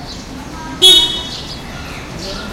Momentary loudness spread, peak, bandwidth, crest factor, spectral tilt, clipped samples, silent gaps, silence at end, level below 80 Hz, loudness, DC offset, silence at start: 22 LU; 0 dBFS; over 20 kHz; 16 dB; -1.5 dB/octave; 0.3%; none; 0 s; -36 dBFS; -8 LUFS; under 0.1%; 0 s